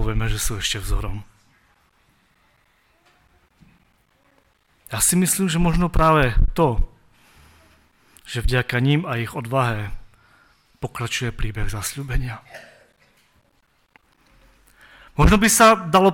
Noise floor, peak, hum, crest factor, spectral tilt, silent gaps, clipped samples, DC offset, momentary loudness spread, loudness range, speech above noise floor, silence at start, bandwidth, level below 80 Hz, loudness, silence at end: -63 dBFS; -2 dBFS; none; 20 dB; -4.5 dB/octave; none; under 0.1%; under 0.1%; 18 LU; 12 LU; 44 dB; 0 s; 17.5 kHz; -30 dBFS; -20 LUFS; 0 s